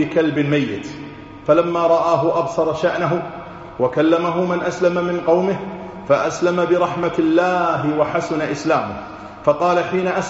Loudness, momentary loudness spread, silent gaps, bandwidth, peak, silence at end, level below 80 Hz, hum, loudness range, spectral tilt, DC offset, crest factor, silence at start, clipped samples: -18 LUFS; 13 LU; none; 8 kHz; -2 dBFS; 0 s; -52 dBFS; none; 1 LU; -5.5 dB/octave; under 0.1%; 16 dB; 0 s; under 0.1%